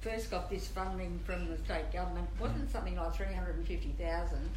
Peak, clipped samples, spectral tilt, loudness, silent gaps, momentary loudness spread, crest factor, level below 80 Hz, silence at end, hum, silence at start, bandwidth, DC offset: -22 dBFS; under 0.1%; -6 dB/octave; -39 LUFS; none; 2 LU; 14 dB; -38 dBFS; 0 s; none; 0 s; 13 kHz; under 0.1%